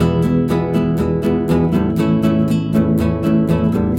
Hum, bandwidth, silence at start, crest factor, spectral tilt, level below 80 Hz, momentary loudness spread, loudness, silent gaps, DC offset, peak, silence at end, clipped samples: none; 16 kHz; 0 s; 12 dB; -8.5 dB/octave; -36 dBFS; 2 LU; -16 LUFS; none; under 0.1%; -2 dBFS; 0 s; under 0.1%